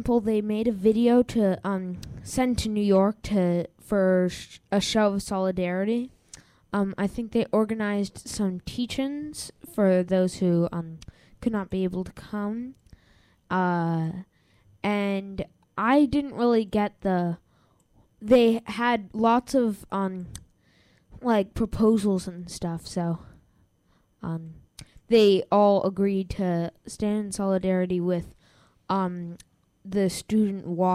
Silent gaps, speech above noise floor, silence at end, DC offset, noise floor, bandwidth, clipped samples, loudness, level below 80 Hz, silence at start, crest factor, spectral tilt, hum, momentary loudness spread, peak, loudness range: none; 41 dB; 0 s; under 0.1%; -65 dBFS; 14.5 kHz; under 0.1%; -25 LUFS; -50 dBFS; 0 s; 18 dB; -6.5 dB/octave; none; 14 LU; -8 dBFS; 6 LU